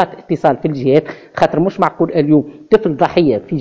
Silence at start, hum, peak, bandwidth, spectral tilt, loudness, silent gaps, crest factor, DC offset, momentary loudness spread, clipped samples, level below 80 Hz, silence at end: 0 s; none; 0 dBFS; 8 kHz; -8.5 dB/octave; -14 LUFS; none; 14 dB; under 0.1%; 4 LU; 0.4%; -48 dBFS; 0 s